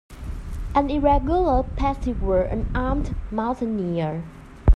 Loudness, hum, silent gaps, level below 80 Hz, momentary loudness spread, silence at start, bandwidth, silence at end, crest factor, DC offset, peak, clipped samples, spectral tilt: -24 LUFS; none; none; -26 dBFS; 14 LU; 0.1 s; 9.2 kHz; 0 s; 18 dB; under 0.1%; -4 dBFS; under 0.1%; -8.5 dB/octave